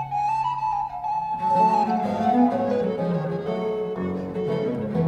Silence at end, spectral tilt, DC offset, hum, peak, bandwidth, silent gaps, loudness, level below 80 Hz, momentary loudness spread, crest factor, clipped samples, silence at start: 0 s; -8.5 dB/octave; under 0.1%; none; -8 dBFS; 9.8 kHz; none; -24 LUFS; -56 dBFS; 8 LU; 14 dB; under 0.1%; 0 s